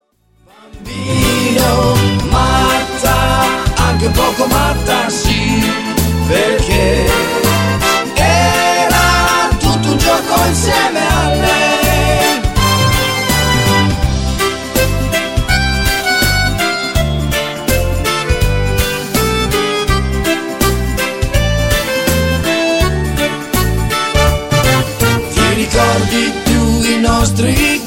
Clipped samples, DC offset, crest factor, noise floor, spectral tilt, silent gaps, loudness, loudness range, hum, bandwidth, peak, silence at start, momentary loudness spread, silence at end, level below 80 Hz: under 0.1%; 0.3%; 12 dB; -51 dBFS; -4 dB/octave; none; -13 LUFS; 3 LU; none; 17 kHz; 0 dBFS; 0.75 s; 4 LU; 0 s; -20 dBFS